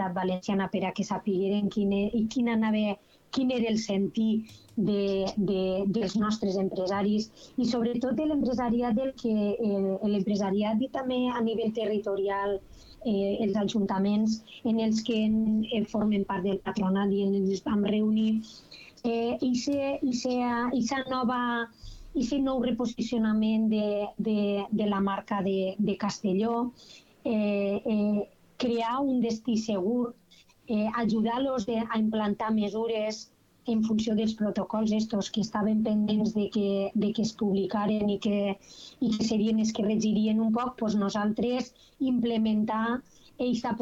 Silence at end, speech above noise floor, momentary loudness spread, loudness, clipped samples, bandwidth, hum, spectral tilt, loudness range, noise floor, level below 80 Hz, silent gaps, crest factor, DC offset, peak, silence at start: 0 s; 32 dB; 5 LU; -28 LUFS; under 0.1%; 7.8 kHz; none; -6.5 dB/octave; 2 LU; -59 dBFS; -58 dBFS; none; 12 dB; under 0.1%; -16 dBFS; 0 s